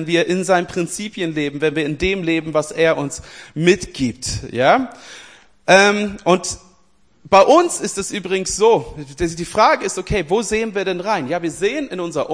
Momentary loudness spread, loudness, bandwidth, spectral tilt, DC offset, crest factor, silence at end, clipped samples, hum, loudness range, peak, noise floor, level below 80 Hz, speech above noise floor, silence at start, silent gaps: 11 LU; -18 LUFS; 10.5 kHz; -4 dB/octave; 0.2%; 18 dB; 0 s; under 0.1%; none; 3 LU; 0 dBFS; -58 dBFS; -42 dBFS; 41 dB; 0 s; none